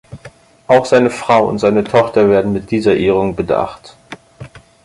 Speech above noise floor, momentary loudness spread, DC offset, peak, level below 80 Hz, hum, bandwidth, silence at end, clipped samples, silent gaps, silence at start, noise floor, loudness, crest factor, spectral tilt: 28 dB; 6 LU; under 0.1%; 0 dBFS; -44 dBFS; none; 11.5 kHz; 0.25 s; under 0.1%; none; 0.1 s; -41 dBFS; -13 LUFS; 14 dB; -6.5 dB/octave